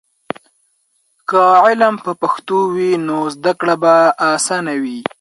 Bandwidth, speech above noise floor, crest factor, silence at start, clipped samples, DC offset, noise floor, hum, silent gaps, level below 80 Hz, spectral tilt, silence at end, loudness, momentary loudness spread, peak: 11.5 kHz; 48 dB; 16 dB; 1.3 s; under 0.1%; under 0.1%; -62 dBFS; none; none; -66 dBFS; -4 dB/octave; 0.2 s; -14 LUFS; 17 LU; 0 dBFS